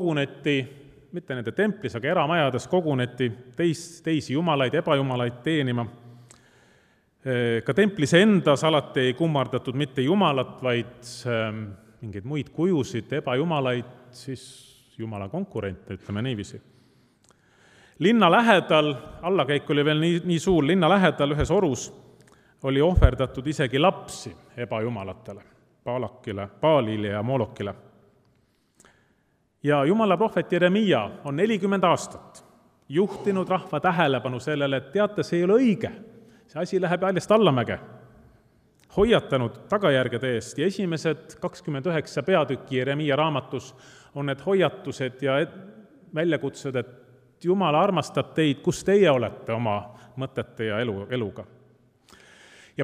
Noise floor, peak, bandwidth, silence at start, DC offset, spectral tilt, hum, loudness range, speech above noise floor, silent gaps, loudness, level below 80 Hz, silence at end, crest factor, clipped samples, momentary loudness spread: -68 dBFS; -2 dBFS; 13.5 kHz; 0 s; under 0.1%; -6 dB/octave; none; 6 LU; 44 dB; none; -24 LUFS; -42 dBFS; 0 s; 24 dB; under 0.1%; 15 LU